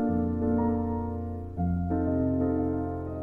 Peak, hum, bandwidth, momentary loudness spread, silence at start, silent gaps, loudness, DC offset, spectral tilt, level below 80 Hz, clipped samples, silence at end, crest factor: -16 dBFS; none; 2.4 kHz; 7 LU; 0 s; none; -29 LUFS; 0.2%; -12.5 dB/octave; -44 dBFS; under 0.1%; 0 s; 12 dB